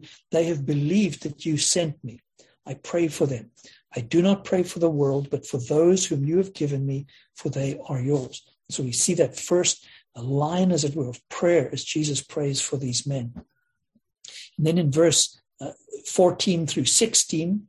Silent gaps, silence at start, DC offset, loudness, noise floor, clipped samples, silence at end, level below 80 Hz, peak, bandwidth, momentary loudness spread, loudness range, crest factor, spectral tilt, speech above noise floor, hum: none; 0.05 s; under 0.1%; -23 LUFS; -70 dBFS; under 0.1%; 0.05 s; -60 dBFS; -6 dBFS; 12.5 kHz; 16 LU; 3 LU; 20 dB; -4.5 dB/octave; 46 dB; none